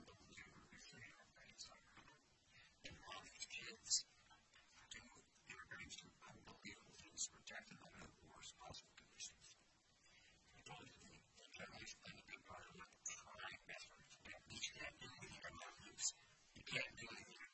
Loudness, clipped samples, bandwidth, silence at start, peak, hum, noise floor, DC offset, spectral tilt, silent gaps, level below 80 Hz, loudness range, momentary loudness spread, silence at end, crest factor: -53 LUFS; under 0.1%; 8.2 kHz; 0 s; -26 dBFS; none; -76 dBFS; under 0.1%; -0.5 dB/octave; none; -78 dBFS; 10 LU; 20 LU; 0 s; 30 dB